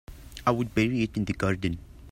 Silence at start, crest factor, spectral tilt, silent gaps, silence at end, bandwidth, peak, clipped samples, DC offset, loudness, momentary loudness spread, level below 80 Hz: 0.1 s; 20 dB; -6.5 dB/octave; none; 0 s; 16 kHz; -8 dBFS; under 0.1%; under 0.1%; -28 LUFS; 9 LU; -46 dBFS